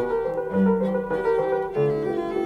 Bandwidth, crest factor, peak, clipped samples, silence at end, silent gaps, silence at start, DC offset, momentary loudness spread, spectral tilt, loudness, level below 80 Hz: 6.2 kHz; 14 dB; -10 dBFS; under 0.1%; 0 s; none; 0 s; under 0.1%; 4 LU; -9 dB/octave; -24 LUFS; -50 dBFS